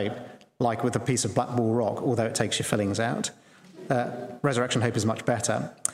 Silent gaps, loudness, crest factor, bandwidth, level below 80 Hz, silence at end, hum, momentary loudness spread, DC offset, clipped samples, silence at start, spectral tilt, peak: none; -27 LUFS; 26 dB; 16 kHz; -62 dBFS; 0 s; none; 7 LU; under 0.1%; under 0.1%; 0 s; -4.5 dB/octave; -2 dBFS